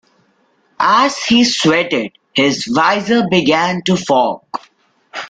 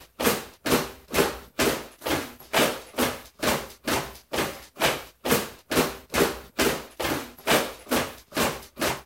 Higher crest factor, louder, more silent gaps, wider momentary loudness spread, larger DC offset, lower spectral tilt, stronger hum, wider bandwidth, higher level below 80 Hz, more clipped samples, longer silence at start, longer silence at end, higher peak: second, 14 dB vs 22 dB; first, -14 LUFS vs -26 LUFS; neither; about the same, 8 LU vs 6 LU; neither; about the same, -4 dB/octave vs -3 dB/octave; neither; second, 9.4 kHz vs 17 kHz; second, -54 dBFS vs -48 dBFS; neither; first, 0.8 s vs 0 s; about the same, 0 s vs 0 s; first, -2 dBFS vs -6 dBFS